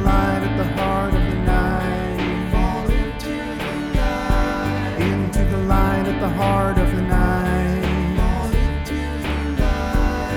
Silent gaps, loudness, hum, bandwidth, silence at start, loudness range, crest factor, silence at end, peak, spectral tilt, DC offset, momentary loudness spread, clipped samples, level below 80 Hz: none; -21 LUFS; none; 16 kHz; 0 s; 3 LU; 14 dB; 0 s; -4 dBFS; -7 dB/octave; under 0.1%; 5 LU; under 0.1%; -22 dBFS